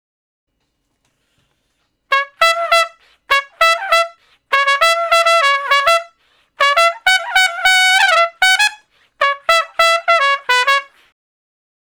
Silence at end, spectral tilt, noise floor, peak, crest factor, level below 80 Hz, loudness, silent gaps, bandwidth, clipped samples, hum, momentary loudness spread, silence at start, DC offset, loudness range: 1.15 s; 3 dB/octave; -68 dBFS; 0 dBFS; 16 dB; -56 dBFS; -13 LUFS; none; over 20 kHz; 0.5%; none; 7 LU; 2.1 s; under 0.1%; 4 LU